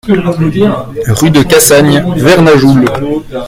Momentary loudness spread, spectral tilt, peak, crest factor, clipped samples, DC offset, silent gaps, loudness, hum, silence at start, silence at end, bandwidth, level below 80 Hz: 9 LU; -5 dB/octave; 0 dBFS; 8 dB; 2%; under 0.1%; none; -7 LUFS; none; 0.05 s; 0 s; over 20 kHz; -32 dBFS